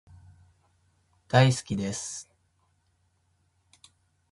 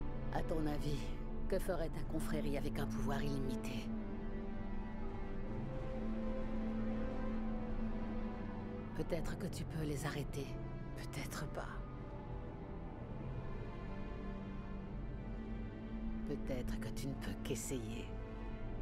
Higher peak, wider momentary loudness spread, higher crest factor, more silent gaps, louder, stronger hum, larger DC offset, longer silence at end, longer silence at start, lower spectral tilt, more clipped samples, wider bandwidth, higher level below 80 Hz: first, -4 dBFS vs -24 dBFS; first, 15 LU vs 7 LU; first, 26 dB vs 16 dB; neither; first, -26 LUFS vs -44 LUFS; neither; neither; first, 2.1 s vs 0 s; first, 1.3 s vs 0 s; second, -5 dB/octave vs -6.5 dB/octave; neither; second, 11.5 kHz vs 15 kHz; second, -60 dBFS vs -44 dBFS